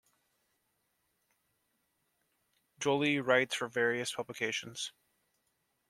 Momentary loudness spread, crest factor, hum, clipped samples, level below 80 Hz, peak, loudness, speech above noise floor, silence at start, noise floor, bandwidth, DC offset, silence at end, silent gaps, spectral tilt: 11 LU; 24 dB; none; under 0.1%; -82 dBFS; -12 dBFS; -33 LUFS; 47 dB; 2.8 s; -79 dBFS; 14.5 kHz; under 0.1%; 1 s; none; -3.5 dB/octave